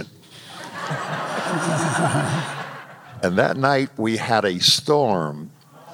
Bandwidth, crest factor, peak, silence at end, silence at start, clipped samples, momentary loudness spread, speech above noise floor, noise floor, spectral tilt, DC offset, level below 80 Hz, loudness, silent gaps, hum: 17 kHz; 20 dB; -2 dBFS; 0 s; 0 s; under 0.1%; 20 LU; 23 dB; -43 dBFS; -4 dB/octave; under 0.1%; -64 dBFS; -21 LUFS; none; none